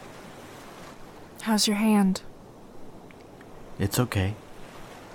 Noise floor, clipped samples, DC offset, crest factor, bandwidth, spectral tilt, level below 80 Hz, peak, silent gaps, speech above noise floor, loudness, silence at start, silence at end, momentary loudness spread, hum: -47 dBFS; under 0.1%; under 0.1%; 20 dB; 19.5 kHz; -4.5 dB/octave; -54 dBFS; -10 dBFS; none; 23 dB; -25 LUFS; 0 s; 0 s; 26 LU; none